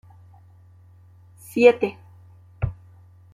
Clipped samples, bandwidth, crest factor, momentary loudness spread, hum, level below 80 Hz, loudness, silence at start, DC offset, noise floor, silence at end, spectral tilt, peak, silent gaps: under 0.1%; 14.5 kHz; 22 dB; 14 LU; none; -48 dBFS; -21 LUFS; 1.55 s; under 0.1%; -50 dBFS; 0.6 s; -6.5 dB/octave; -2 dBFS; none